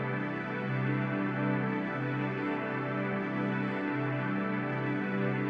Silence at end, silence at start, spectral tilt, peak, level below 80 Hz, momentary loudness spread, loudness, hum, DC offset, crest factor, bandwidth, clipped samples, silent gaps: 0 s; 0 s; -9 dB/octave; -18 dBFS; -72 dBFS; 2 LU; -32 LUFS; none; under 0.1%; 14 dB; 5.6 kHz; under 0.1%; none